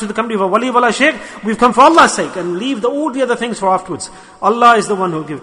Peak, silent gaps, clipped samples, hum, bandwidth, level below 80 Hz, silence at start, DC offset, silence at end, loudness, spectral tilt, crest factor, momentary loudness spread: 0 dBFS; none; 0.2%; none; 11 kHz; -50 dBFS; 0 s; under 0.1%; 0 s; -13 LUFS; -4 dB/octave; 14 dB; 12 LU